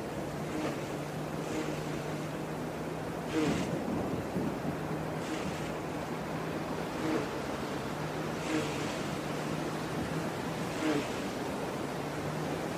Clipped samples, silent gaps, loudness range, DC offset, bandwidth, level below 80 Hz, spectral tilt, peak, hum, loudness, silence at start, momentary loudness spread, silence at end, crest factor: under 0.1%; none; 1 LU; under 0.1%; 15.5 kHz; -56 dBFS; -5.5 dB/octave; -18 dBFS; none; -35 LUFS; 0 s; 5 LU; 0 s; 16 dB